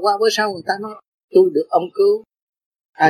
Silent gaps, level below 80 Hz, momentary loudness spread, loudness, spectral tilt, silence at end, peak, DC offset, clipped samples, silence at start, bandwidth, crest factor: 1.08-1.28 s, 2.42-2.53 s, 2.66-2.71 s, 2.85-2.93 s; -72 dBFS; 9 LU; -18 LUFS; -4 dB/octave; 0 s; -2 dBFS; under 0.1%; under 0.1%; 0 s; 13 kHz; 16 dB